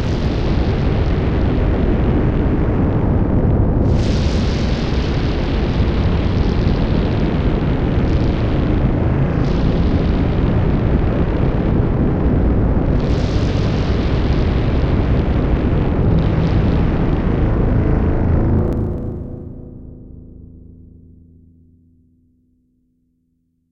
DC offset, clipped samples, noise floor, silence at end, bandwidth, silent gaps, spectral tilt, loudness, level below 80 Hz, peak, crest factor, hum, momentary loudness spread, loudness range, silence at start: under 0.1%; under 0.1%; -65 dBFS; 2.85 s; 7.2 kHz; none; -8.5 dB/octave; -17 LUFS; -20 dBFS; -2 dBFS; 14 dB; none; 3 LU; 3 LU; 0 s